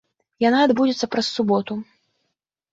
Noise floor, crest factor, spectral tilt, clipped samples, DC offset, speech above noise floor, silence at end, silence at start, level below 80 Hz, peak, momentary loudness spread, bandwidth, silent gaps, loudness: -77 dBFS; 16 dB; -5 dB/octave; under 0.1%; under 0.1%; 58 dB; 0.9 s; 0.4 s; -64 dBFS; -6 dBFS; 9 LU; 7.8 kHz; none; -20 LUFS